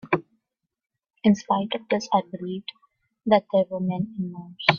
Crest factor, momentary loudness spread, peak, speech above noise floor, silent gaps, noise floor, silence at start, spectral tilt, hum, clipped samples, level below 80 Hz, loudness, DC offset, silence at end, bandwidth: 24 dB; 13 LU; 0 dBFS; 58 dB; none; -81 dBFS; 0.05 s; -6 dB/octave; none; under 0.1%; -66 dBFS; -25 LUFS; under 0.1%; 0 s; 7.2 kHz